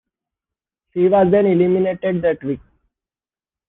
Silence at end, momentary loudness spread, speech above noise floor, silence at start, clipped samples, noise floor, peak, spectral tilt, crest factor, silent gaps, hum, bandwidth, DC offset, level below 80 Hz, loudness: 1.1 s; 14 LU; over 74 dB; 0.95 s; under 0.1%; under -90 dBFS; -4 dBFS; -11.5 dB/octave; 16 dB; none; none; 3.9 kHz; under 0.1%; -54 dBFS; -17 LUFS